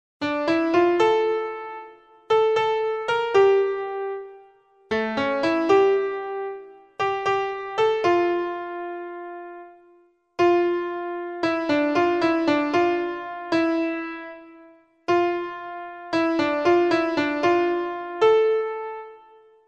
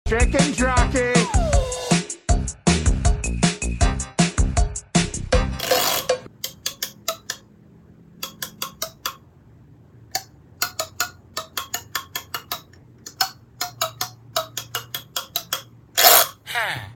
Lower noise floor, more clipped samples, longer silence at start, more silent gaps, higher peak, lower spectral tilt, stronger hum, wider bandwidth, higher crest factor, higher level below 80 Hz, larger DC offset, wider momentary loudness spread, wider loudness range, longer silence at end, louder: first, -58 dBFS vs -49 dBFS; neither; first, 0.2 s vs 0.05 s; neither; second, -6 dBFS vs 0 dBFS; first, -5.5 dB/octave vs -3.5 dB/octave; neither; second, 8 kHz vs 17 kHz; second, 16 dB vs 22 dB; second, -62 dBFS vs -28 dBFS; neither; first, 16 LU vs 12 LU; second, 4 LU vs 11 LU; first, 0.5 s vs 0 s; about the same, -22 LUFS vs -22 LUFS